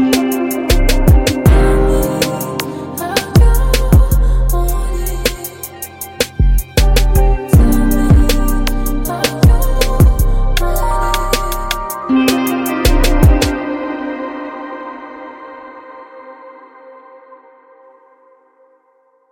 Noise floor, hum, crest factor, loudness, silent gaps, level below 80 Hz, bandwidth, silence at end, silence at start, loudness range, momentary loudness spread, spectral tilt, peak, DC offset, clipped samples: -55 dBFS; none; 12 dB; -14 LUFS; none; -16 dBFS; 17 kHz; 2.4 s; 0 s; 12 LU; 16 LU; -5.5 dB/octave; 0 dBFS; under 0.1%; under 0.1%